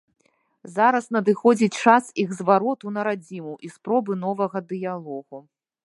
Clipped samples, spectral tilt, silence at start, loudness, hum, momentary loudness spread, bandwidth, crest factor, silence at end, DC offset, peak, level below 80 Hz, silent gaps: under 0.1%; -6 dB/octave; 0.65 s; -22 LUFS; none; 17 LU; 11.5 kHz; 22 dB; 0.45 s; under 0.1%; 0 dBFS; -78 dBFS; none